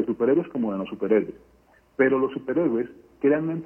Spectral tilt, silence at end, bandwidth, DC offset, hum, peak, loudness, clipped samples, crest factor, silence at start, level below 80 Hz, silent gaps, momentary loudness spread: -9.5 dB/octave; 0 s; 3.2 kHz; under 0.1%; none; -6 dBFS; -24 LUFS; under 0.1%; 18 dB; 0 s; -62 dBFS; none; 8 LU